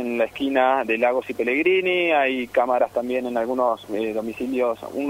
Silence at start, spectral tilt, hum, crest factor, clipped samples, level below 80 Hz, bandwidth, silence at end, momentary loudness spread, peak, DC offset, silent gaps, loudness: 0 s; -5 dB/octave; none; 16 dB; under 0.1%; -60 dBFS; 16 kHz; 0 s; 7 LU; -6 dBFS; under 0.1%; none; -22 LUFS